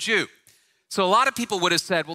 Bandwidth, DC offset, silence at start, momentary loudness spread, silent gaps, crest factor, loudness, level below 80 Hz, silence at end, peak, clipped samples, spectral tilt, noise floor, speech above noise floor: 16 kHz; under 0.1%; 0 s; 10 LU; none; 18 dB; -22 LUFS; -66 dBFS; 0 s; -6 dBFS; under 0.1%; -2.5 dB/octave; -60 dBFS; 38 dB